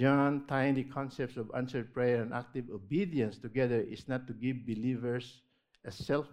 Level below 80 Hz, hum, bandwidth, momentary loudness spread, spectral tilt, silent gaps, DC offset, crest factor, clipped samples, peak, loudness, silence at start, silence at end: -66 dBFS; none; 10.5 kHz; 9 LU; -8 dB/octave; none; under 0.1%; 20 dB; under 0.1%; -14 dBFS; -34 LUFS; 0 s; 0 s